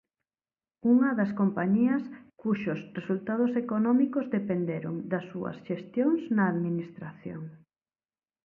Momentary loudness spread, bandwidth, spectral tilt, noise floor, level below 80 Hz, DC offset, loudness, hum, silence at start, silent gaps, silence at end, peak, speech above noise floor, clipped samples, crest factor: 15 LU; 4.3 kHz; -10 dB/octave; under -90 dBFS; -72 dBFS; under 0.1%; -28 LUFS; none; 0.85 s; none; 0.9 s; -14 dBFS; over 62 dB; under 0.1%; 16 dB